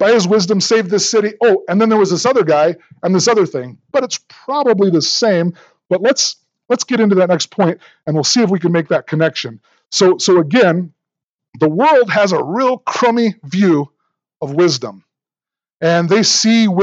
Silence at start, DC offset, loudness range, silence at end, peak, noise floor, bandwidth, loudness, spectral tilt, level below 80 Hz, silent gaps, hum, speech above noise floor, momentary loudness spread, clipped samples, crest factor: 0 s; under 0.1%; 2 LU; 0 s; 0 dBFS; under -90 dBFS; 8.8 kHz; -14 LUFS; -4.5 dB/octave; -72 dBFS; 11.26-11.39 s, 11.49-11.53 s; none; over 77 dB; 10 LU; under 0.1%; 14 dB